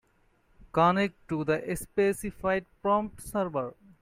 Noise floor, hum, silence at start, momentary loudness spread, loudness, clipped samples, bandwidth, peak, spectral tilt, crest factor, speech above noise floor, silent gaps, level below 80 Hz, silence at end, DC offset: -67 dBFS; none; 0.75 s; 8 LU; -29 LUFS; under 0.1%; 16 kHz; -12 dBFS; -6 dB/octave; 18 dB; 38 dB; none; -54 dBFS; 0.3 s; under 0.1%